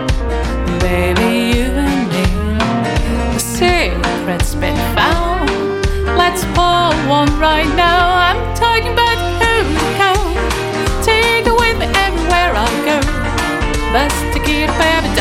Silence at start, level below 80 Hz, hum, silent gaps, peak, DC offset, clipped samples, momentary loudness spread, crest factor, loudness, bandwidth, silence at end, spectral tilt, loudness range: 0 s; -20 dBFS; none; none; 0 dBFS; under 0.1%; under 0.1%; 5 LU; 12 dB; -14 LUFS; 17 kHz; 0 s; -4.5 dB/octave; 3 LU